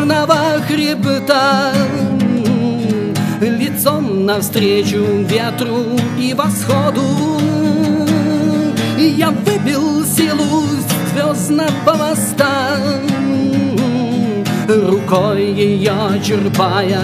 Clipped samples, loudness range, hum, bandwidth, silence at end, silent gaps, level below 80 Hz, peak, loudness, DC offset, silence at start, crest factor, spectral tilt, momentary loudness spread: under 0.1%; 1 LU; none; 15.5 kHz; 0 s; none; -54 dBFS; 0 dBFS; -14 LUFS; under 0.1%; 0 s; 14 dB; -5.5 dB/octave; 3 LU